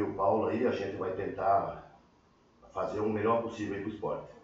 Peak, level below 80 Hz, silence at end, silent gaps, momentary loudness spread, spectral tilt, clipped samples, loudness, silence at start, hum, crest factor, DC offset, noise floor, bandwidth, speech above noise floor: -16 dBFS; -62 dBFS; 0.05 s; none; 9 LU; -6 dB/octave; under 0.1%; -32 LUFS; 0 s; none; 16 dB; under 0.1%; -64 dBFS; 7.8 kHz; 32 dB